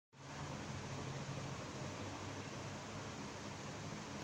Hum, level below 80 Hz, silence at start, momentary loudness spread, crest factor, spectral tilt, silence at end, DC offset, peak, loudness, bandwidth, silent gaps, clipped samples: none; -66 dBFS; 0.15 s; 2 LU; 14 dB; -4.5 dB/octave; 0 s; under 0.1%; -32 dBFS; -47 LUFS; 16 kHz; none; under 0.1%